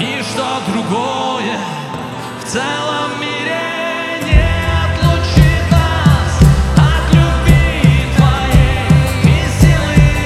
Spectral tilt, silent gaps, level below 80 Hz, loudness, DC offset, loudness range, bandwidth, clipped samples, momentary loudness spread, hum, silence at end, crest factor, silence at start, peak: -6 dB/octave; none; -18 dBFS; -13 LUFS; under 0.1%; 7 LU; 14 kHz; under 0.1%; 8 LU; none; 0 s; 12 dB; 0 s; 0 dBFS